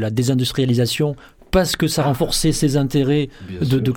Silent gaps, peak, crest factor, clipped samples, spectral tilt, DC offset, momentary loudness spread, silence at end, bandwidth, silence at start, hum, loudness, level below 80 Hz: none; -4 dBFS; 14 dB; under 0.1%; -5.5 dB/octave; under 0.1%; 5 LU; 0 s; 17.5 kHz; 0 s; none; -19 LUFS; -36 dBFS